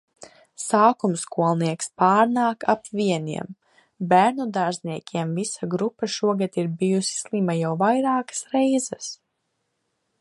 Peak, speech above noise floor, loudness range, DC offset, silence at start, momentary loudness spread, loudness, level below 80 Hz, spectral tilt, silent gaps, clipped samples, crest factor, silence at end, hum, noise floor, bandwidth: -4 dBFS; 53 dB; 3 LU; under 0.1%; 0.2 s; 12 LU; -23 LUFS; -72 dBFS; -5 dB/octave; none; under 0.1%; 20 dB; 1.05 s; none; -75 dBFS; 11.5 kHz